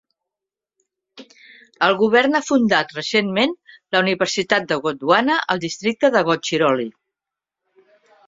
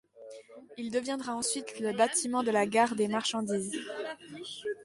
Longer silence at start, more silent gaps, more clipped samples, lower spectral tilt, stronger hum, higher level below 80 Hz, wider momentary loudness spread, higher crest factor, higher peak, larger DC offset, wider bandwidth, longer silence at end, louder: first, 1.15 s vs 0.15 s; neither; neither; about the same, -4 dB/octave vs -3 dB/octave; neither; first, -64 dBFS vs -74 dBFS; second, 7 LU vs 19 LU; about the same, 20 dB vs 20 dB; first, 0 dBFS vs -12 dBFS; neither; second, 7.8 kHz vs 11.5 kHz; first, 1.35 s vs 0 s; first, -18 LUFS vs -31 LUFS